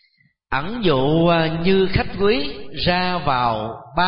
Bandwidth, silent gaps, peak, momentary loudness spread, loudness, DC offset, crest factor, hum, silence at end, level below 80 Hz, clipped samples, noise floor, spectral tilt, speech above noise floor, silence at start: 5.6 kHz; none; -6 dBFS; 9 LU; -20 LUFS; under 0.1%; 14 dB; none; 0 s; -38 dBFS; under 0.1%; -61 dBFS; -11 dB/octave; 42 dB; 0.5 s